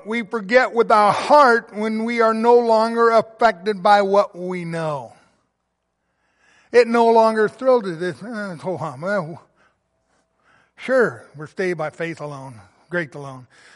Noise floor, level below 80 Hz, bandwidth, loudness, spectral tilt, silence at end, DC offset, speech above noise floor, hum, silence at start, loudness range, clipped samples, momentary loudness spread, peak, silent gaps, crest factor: -74 dBFS; -66 dBFS; 11.5 kHz; -18 LUFS; -5.5 dB/octave; 0.35 s; under 0.1%; 55 dB; none; 0.05 s; 10 LU; under 0.1%; 16 LU; -2 dBFS; none; 16 dB